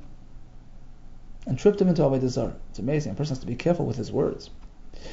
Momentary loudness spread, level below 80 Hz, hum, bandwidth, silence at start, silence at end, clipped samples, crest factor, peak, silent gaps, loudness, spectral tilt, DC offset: 16 LU; -42 dBFS; none; 7.8 kHz; 0 s; 0 s; under 0.1%; 20 dB; -6 dBFS; none; -26 LUFS; -7.5 dB/octave; under 0.1%